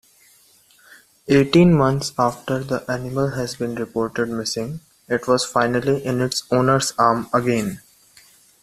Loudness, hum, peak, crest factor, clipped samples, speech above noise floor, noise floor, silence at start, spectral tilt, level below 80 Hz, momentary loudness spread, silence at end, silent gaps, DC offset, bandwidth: -20 LUFS; none; -2 dBFS; 18 dB; under 0.1%; 35 dB; -54 dBFS; 1.25 s; -5.5 dB/octave; -50 dBFS; 11 LU; 0.85 s; none; under 0.1%; 14.5 kHz